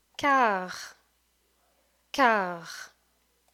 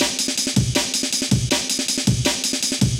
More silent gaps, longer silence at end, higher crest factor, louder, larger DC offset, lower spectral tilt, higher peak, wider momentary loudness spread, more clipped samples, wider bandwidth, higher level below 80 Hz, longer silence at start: neither; first, 0.65 s vs 0 s; first, 22 dB vs 14 dB; second, -26 LUFS vs -19 LUFS; neither; about the same, -3.5 dB/octave vs -3 dB/octave; about the same, -8 dBFS vs -6 dBFS; first, 20 LU vs 1 LU; neither; about the same, 17 kHz vs 17 kHz; second, -70 dBFS vs -38 dBFS; first, 0.2 s vs 0 s